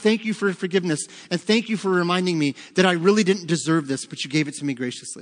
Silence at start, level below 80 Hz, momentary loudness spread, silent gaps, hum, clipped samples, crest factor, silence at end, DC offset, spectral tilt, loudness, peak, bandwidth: 0 s; -72 dBFS; 9 LU; none; none; under 0.1%; 20 dB; 0 s; under 0.1%; -5 dB/octave; -22 LUFS; -2 dBFS; 10.5 kHz